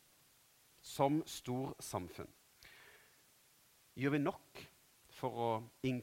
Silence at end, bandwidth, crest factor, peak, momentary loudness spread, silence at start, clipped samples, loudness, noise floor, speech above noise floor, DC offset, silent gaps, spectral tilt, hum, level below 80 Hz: 0 s; 16 kHz; 24 dB; -18 dBFS; 24 LU; 0.85 s; under 0.1%; -40 LUFS; -69 dBFS; 30 dB; under 0.1%; none; -5.5 dB/octave; none; -74 dBFS